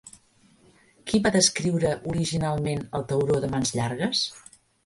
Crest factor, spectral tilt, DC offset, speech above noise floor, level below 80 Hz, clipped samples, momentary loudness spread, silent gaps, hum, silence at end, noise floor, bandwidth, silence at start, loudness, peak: 20 dB; -4 dB/octave; under 0.1%; 35 dB; -52 dBFS; under 0.1%; 8 LU; none; none; 0.45 s; -59 dBFS; 11.5 kHz; 0.05 s; -25 LUFS; -6 dBFS